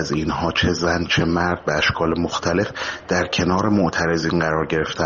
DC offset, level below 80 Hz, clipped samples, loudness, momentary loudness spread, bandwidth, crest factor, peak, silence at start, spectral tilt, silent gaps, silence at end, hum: under 0.1%; -40 dBFS; under 0.1%; -20 LUFS; 4 LU; 7.4 kHz; 14 dB; -6 dBFS; 0 s; -4 dB/octave; none; 0 s; none